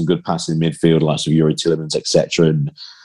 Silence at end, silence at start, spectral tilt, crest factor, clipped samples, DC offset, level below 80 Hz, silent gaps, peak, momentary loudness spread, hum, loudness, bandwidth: 0.1 s; 0 s; -5.5 dB/octave; 16 dB; under 0.1%; 0.3%; -54 dBFS; none; 0 dBFS; 5 LU; none; -17 LUFS; 11.5 kHz